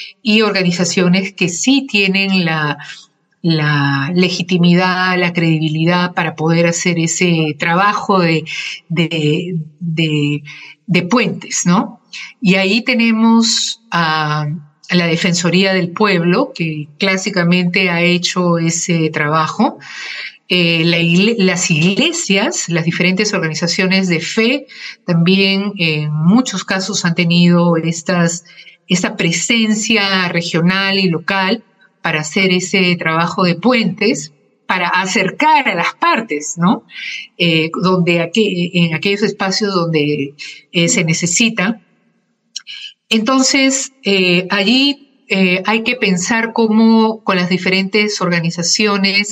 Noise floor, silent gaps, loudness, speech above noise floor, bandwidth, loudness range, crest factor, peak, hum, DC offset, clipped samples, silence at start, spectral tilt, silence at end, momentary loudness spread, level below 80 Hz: -61 dBFS; none; -14 LUFS; 47 dB; 9.4 kHz; 2 LU; 14 dB; -2 dBFS; none; under 0.1%; under 0.1%; 0 s; -4.5 dB/octave; 0 s; 8 LU; -62 dBFS